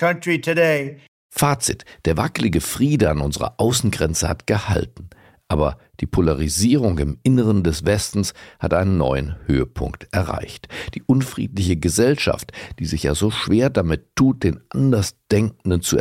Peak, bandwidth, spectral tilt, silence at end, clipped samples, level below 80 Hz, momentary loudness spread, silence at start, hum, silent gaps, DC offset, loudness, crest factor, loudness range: -6 dBFS; 16.5 kHz; -5.5 dB/octave; 0 s; under 0.1%; -34 dBFS; 9 LU; 0 s; none; 1.08-1.30 s; under 0.1%; -20 LUFS; 14 dB; 3 LU